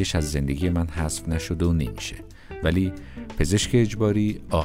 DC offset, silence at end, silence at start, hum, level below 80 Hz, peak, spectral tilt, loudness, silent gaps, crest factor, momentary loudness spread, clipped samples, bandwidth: under 0.1%; 0 s; 0 s; none; -34 dBFS; -8 dBFS; -5.5 dB/octave; -24 LUFS; none; 16 dB; 13 LU; under 0.1%; 16 kHz